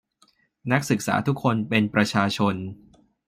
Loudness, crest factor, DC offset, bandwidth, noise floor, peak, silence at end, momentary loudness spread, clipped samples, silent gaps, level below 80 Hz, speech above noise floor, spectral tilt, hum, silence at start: -23 LUFS; 20 dB; under 0.1%; 16 kHz; -63 dBFS; -4 dBFS; 0.55 s; 9 LU; under 0.1%; none; -62 dBFS; 40 dB; -5.5 dB/octave; none; 0.65 s